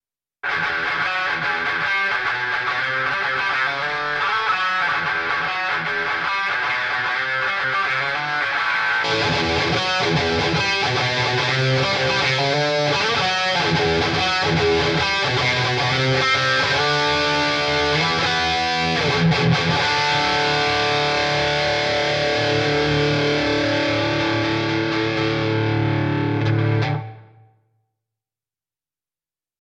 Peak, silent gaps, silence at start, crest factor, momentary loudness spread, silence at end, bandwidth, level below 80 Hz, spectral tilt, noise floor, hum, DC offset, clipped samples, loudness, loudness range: -6 dBFS; none; 0.45 s; 14 dB; 3 LU; 2.4 s; 10.5 kHz; -46 dBFS; -4.5 dB/octave; under -90 dBFS; none; under 0.1%; under 0.1%; -19 LUFS; 3 LU